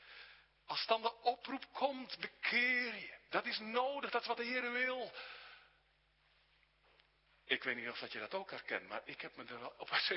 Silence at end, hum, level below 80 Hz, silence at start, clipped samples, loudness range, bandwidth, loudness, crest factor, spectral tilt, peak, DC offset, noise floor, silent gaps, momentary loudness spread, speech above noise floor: 0 s; none; -82 dBFS; 0 s; under 0.1%; 7 LU; 5.8 kHz; -39 LUFS; 24 dB; 1 dB/octave; -18 dBFS; under 0.1%; -75 dBFS; none; 14 LU; 35 dB